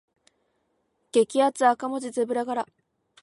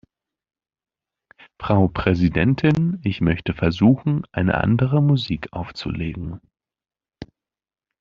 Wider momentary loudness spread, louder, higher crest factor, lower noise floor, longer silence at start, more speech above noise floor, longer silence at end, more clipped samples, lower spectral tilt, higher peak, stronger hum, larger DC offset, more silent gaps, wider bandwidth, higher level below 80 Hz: second, 9 LU vs 12 LU; second, -25 LUFS vs -20 LUFS; about the same, 20 dB vs 18 dB; second, -73 dBFS vs under -90 dBFS; second, 1.15 s vs 1.6 s; second, 49 dB vs over 71 dB; second, 0.6 s vs 0.75 s; neither; second, -3.5 dB/octave vs -6.5 dB/octave; second, -6 dBFS vs -2 dBFS; neither; neither; neither; first, 11.5 kHz vs 7 kHz; second, -80 dBFS vs -44 dBFS